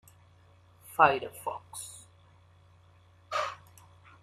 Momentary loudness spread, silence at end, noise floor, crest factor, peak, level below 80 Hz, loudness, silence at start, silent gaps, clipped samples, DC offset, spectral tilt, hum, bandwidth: 21 LU; 0.65 s; -60 dBFS; 28 dB; -6 dBFS; -72 dBFS; -30 LUFS; 0.9 s; none; under 0.1%; under 0.1%; -3 dB/octave; none; 15 kHz